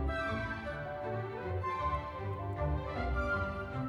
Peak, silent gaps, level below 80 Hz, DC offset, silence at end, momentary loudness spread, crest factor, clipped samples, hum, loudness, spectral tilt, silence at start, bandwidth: -22 dBFS; none; -42 dBFS; under 0.1%; 0 s; 5 LU; 14 dB; under 0.1%; none; -37 LUFS; -7.5 dB/octave; 0 s; 11 kHz